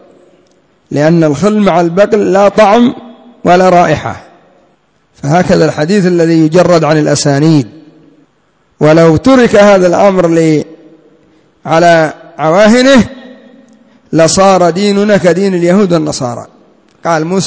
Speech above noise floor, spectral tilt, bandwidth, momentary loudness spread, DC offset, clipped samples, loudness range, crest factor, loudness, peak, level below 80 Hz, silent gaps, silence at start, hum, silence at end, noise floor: 46 dB; -6 dB/octave; 8 kHz; 10 LU; under 0.1%; 2%; 2 LU; 8 dB; -8 LUFS; 0 dBFS; -40 dBFS; none; 0.9 s; none; 0 s; -53 dBFS